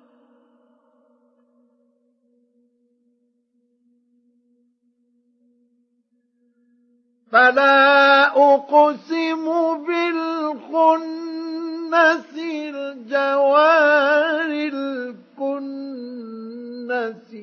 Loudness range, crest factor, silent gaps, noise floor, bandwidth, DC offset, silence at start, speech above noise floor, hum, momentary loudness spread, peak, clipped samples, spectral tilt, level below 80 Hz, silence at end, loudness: 6 LU; 20 dB; none; -67 dBFS; 6.6 kHz; under 0.1%; 7.3 s; 51 dB; none; 18 LU; -2 dBFS; under 0.1%; -3.5 dB/octave; -88 dBFS; 0 s; -18 LUFS